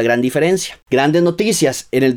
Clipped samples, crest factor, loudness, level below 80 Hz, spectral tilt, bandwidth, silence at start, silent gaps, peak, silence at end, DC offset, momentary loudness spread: under 0.1%; 12 dB; -15 LUFS; -54 dBFS; -4.5 dB/octave; 17.5 kHz; 0 s; none; -4 dBFS; 0 s; under 0.1%; 3 LU